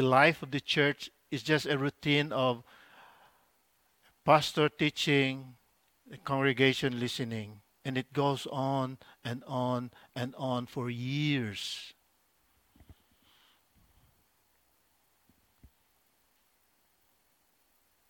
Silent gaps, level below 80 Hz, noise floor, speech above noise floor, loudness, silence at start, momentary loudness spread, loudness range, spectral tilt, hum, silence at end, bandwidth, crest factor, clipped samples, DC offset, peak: none; -70 dBFS; -72 dBFS; 41 dB; -31 LUFS; 0 s; 15 LU; 8 LU; -5.5 dB/octave; none; 5.2 s; 18 kHz; 26 dB; under 0.1%; under 0.1%; -8 dBFS